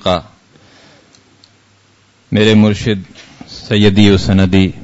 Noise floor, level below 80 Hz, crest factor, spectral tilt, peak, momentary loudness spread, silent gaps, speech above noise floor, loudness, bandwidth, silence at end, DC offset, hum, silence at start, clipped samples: -51 dBFS; -38 dBFS; 14 dB; -6.5 dB/octave; 0 dBFS; 12 LU; none; 40 dB; -12 LUFS; 8 kHz; 0 s; under 0.1%; none; 0.05 s; under 0.1%